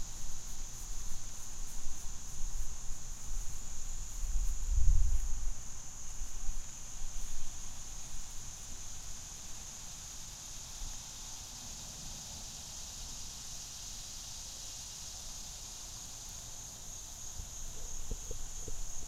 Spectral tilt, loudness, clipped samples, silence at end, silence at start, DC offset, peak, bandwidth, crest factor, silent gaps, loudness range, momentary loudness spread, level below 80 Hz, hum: -2 dB/octave; -43 LUFS; under 0.1%; 0 s; 0 s; under 0.1%; -12 dBFS; 14.5 kHz; 22 dB; none; 5 LU; 5 LU; -38 dBFS; none